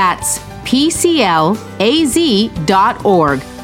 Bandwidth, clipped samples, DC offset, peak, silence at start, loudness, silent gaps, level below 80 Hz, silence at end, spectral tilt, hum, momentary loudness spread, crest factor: 17 kHz; under 0.1%; under 0.1%; 0 dBFS; 0 s; -13 LUFS; none; -38 dBFS; 0 s; -4 dB/octave; none; 5 LU; 12 dB